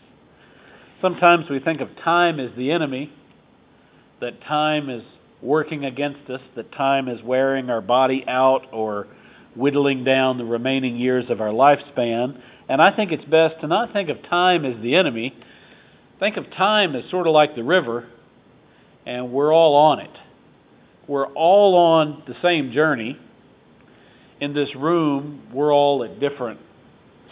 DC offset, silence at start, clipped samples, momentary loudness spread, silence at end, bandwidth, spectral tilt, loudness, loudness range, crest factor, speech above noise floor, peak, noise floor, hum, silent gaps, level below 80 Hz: under 0.1%; 1.05 s; under 0.1%; 15 LU; 0.75 s; 4 kHz; -9.5 dB/octave; -19 LUFS; 5 LU; 20 dB; 34 dB; 0 dBFS; -54 dBFS; none; none; -68 dBFS